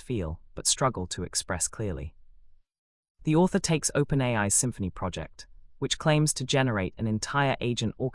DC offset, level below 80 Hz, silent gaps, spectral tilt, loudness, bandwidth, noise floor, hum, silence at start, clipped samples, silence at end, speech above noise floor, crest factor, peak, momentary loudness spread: under 0.1%; -48 dBFS; 2.78-3.03 s, 3.10-3.15 s; -4 dB/octave; -27 LUFS; 12 kHz; -54 dBFS; none; 0.05 s; under 0.1%; 0 s; 27 dB; 18 dB; -10 dBFS; 11 LU